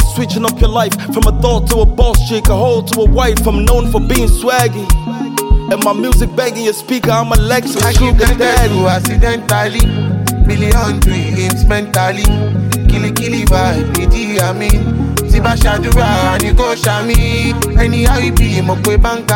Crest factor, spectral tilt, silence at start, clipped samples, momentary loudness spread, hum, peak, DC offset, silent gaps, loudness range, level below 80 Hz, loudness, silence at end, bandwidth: 10 dB; -5 dB/octave; 0 s; under 0.1%; 4 LU; none; 0 dBFS; 0.2%; none; 1 LU; -14 dBFS; -13 LUFS; 0 s; 17 kHz